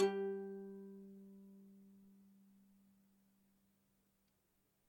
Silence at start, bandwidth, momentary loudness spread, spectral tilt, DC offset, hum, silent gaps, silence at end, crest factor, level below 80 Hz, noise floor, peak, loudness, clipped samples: 0 s; 16.5 kHz; 23 LU; -6.5 dB/octave; under 0.1%; none; none; 2.65 s; 24 dB; -90 dBFS; -81 dBFS; -24 dBFS; -46 LUFS; under 0.1%